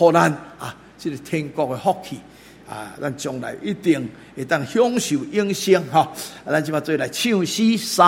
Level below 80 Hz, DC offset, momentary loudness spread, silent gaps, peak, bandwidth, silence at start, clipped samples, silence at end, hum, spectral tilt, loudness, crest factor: -60 dBFS; under 0.1%; 16 LU; none; 0 dBFS; 16.5 kHz; 0 s; under 0.1%; 0 s; none; -4.5 dB/octave; -21 LUFS; 20 dB